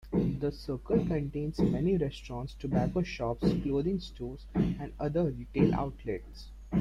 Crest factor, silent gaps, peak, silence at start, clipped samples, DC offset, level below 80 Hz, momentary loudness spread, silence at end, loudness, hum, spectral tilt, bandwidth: 20 dB; none; -12 dBFS; 0.05 s; under 0.1%; under 0.1%; -44 dBFS; 11 LU; 0 s; -32 LUFS; none; -8.5 dB/octave; 9.8 kHz